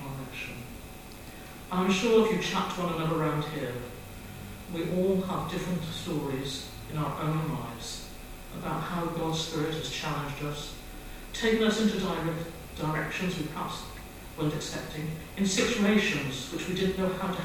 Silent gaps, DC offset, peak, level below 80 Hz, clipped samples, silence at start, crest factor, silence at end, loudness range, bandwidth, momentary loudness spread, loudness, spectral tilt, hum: none; under 0.1%; -12 dBFS; -48 dBFS; under 0.1%; 0 s; 18 dB; 0 s; 5 LU; 17.5 kHz; 18 LU; -30 LUFS; -5 dB/octave; none